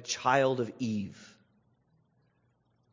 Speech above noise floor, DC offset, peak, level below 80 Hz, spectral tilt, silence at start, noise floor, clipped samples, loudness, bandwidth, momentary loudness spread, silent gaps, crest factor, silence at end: 42 dB; under 0.1%; -10 dBFS; -68 dBFS; -4.5 dB/octave; 0 s; -72 dBFS; under 0.1%; -30 LUFS; 7.6 kHz; 11 LU; none; 24 dB; 1.65 s